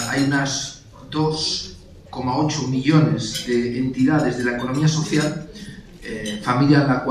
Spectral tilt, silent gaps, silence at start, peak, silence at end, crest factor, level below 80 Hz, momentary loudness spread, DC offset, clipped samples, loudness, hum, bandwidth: -5.5 dB/octave; none; 0 s; -2 dBFS; 0 s; 18 dB; -48 dBFS; 17 LU; under 0.1%; under 0.1%; -20 LUFS; none; 14.5 kHz